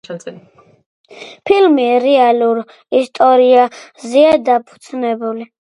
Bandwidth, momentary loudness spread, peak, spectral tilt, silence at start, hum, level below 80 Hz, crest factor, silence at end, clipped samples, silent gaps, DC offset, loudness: 11 kHz; 18 LU; 0 dBFS; -5 dB/octave; 0.1 s; none; -58 dBFS; 14 dB; 0.35 s; under 0.1%; 0.86-1.04 s; under 0.1%; -13 LUFS